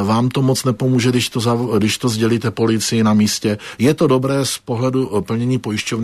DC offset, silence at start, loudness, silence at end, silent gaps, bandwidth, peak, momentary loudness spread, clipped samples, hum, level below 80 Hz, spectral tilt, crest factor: under 0.1%; 0 s; -17 LUFS; 0 s; none; 13.5 kHz; -2 dBFS; 5 LU; under 0.1%; none; -52 dBFS; -5.5 dB/octave; 14 dB